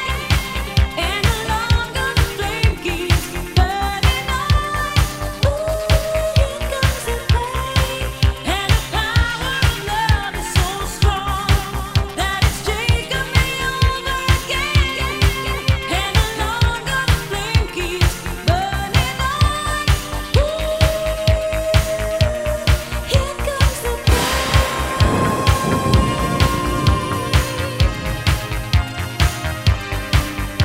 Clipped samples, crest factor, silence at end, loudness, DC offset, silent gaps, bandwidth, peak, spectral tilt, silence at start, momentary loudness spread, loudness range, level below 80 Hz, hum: under 0.1%; 16 dB; 0 s; -19 LUFS; under 0.1%; none; 16.5 kHz; 0 dBFS; -4.5 dB/octave; 0 s; 3 LU; 2 LU; -22 dBFS; none